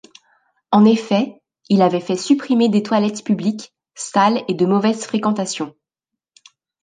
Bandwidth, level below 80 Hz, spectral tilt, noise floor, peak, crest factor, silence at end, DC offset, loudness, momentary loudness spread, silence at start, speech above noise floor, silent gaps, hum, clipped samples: 9.6 kHz; -68 dBFS; -5.5 dB/octave; -84 dBFS; -2 dBFS; 16 dB; 1.1 s; under 0.1%; -18 LUFS; 13 LU; 0.7 s; 67 dB; none; none; under 0.1%